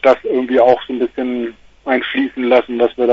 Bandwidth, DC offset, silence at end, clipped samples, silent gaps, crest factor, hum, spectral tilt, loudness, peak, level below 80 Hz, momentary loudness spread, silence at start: 7.4 kHz; under 0.1%; 0 s; under 0.1%; none; 14 dB; none; -6 dB/octave; -16 LUFS; 0 dBFS; -52 dBFS; 9 LU; 0 s